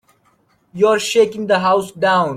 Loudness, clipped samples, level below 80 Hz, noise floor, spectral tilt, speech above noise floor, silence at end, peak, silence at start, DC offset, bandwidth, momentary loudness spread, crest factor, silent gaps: -16 LUFS; under 0.1%; -60 dBFS; -59 dBFS; -4 dB/octave; 43 dB; 0 s; -2 dBFS; 0.75 s; under 0.1%; 15.5 kHz; 3 LU; 14 dB; none